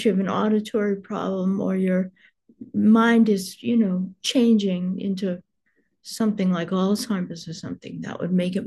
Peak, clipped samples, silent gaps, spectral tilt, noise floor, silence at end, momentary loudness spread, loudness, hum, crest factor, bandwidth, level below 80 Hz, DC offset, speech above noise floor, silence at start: -6 dBFS; under 0.1%; none; -6.5 dB/octave; -70 dBFS; 0 s; 15 LU; -22 LUFS; none; 16 dB; 12.5 kHz; -70 dBFS; under 0.1%; 48 dB; 0 s